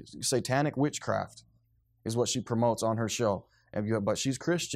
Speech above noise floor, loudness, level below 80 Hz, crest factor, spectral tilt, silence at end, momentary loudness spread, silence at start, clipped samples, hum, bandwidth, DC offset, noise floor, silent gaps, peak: 39 dB; -30 LUFS; -66 dBFS; 18 dB; -4.5 dB/octave; 0 s; 8 LU; 0 s; under 0.1%; none; 15.5 kHz; under 0.1%; -69 dBFS; none; -14 dBFS